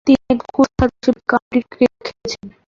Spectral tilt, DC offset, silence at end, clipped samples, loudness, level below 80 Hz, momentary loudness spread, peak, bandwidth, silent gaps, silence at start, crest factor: -6 dB/octave; under 0.1%; 0.2 s; under 0.1%; -18 LUFS; -36 dBFS; 12 LU; -2 dBFS; 7.4 kHz; 1.42-1.51 s; 0.05 s; 16 dB